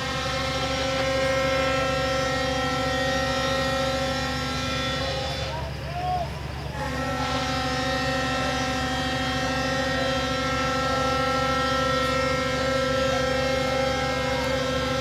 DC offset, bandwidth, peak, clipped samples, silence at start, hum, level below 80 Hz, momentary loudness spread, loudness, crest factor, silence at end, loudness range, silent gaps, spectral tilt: under 0.1%; 16 kHz; -10 dBFS; under 0.1%; 0 s; none; -38 dBFS; 5 LU; -25 LUFS; 14 dB; 0 s; 4 LU; none; -4 dB/octave